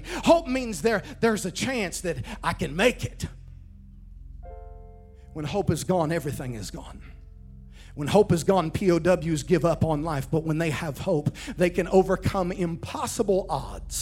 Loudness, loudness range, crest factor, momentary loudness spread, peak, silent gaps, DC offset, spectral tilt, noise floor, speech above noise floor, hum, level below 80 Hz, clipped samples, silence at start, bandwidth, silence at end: -25 LUFS; 7 LU; 22 dB; 16 LU; -4 dBFS; none; under 0.1%; -5.5 dB/octave; -46 dBFS; 21 dB; none; -42 dBFS; under 0.1%; 0 s; 17 kHz; 0 s